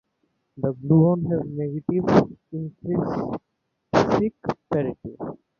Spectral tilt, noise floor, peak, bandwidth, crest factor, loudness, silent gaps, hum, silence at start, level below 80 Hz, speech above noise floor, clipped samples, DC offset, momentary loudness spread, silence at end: -8.5 dB/octave; -74 dBFS; -2 dBFS; 7 kHz; 22 dB; -23 LUFS; none; none; 0.55 s; -52 dBFS; 51 dB; under 0.1%; under 0.1%; 15 LU; 0.25 s